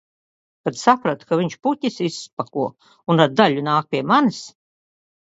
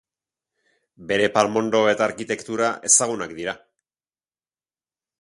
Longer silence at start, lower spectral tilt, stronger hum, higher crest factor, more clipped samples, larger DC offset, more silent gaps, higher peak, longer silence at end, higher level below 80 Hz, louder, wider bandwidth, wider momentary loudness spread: second, 0.65 s vs 1 s; first, -5.5 dB/octave vs -2.5 dB/octave; neither; about the same, 20 dB vs 22 dB; neither; neither; first, 2.33-2.37 s vs none; about the same, 0 dBFS vs -2 dBFS; second, 0.85 s vs 1.65 s; about the same, -66 dBFS vs -64 dBFS; about the same, -20 LUFS vs -21 LUFS; second, 8 kHz vs 11.5 kHz; about the same, 12 LU vs 13 LU